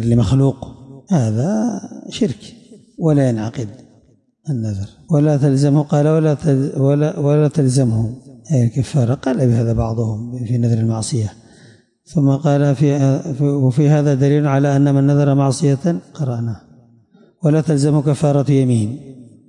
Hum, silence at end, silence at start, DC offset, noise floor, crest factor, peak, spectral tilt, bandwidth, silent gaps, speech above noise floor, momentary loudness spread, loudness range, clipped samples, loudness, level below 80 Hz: none; 0.25 s; 0 s; under 0.1%; -54 dBFS; 12 dB; -4 dBFS; -8 dB/octave; 11 kHz; none; 39 dB; 11 LU; 5 LU; under 0.1%; -16 LUFS; -44 dBFS